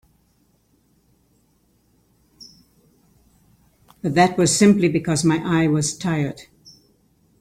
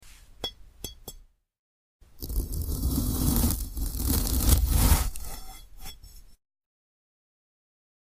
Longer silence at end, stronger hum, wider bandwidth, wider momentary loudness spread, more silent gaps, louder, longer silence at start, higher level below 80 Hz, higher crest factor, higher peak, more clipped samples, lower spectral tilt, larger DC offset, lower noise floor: second, 1 s vs 1.85 s; neither; about the same, 15 kHz vs 16 kHz; second, 11 LU vs 22 LU; second, none vs 1.59-2.00 s; first, -19 LUFS vs -27 LUFS; first, 4.05 s vs 0.05 s; second, -56 dBFS vs -32 dBFS; about the same, 20 dB vs 22 dB; about the same, -4 dBFS vs -6 dBFS; neither; about the same, -5 dB/octave vs -4.5 dB/octave; neither; first, -62 dBFS vs -52 dBFS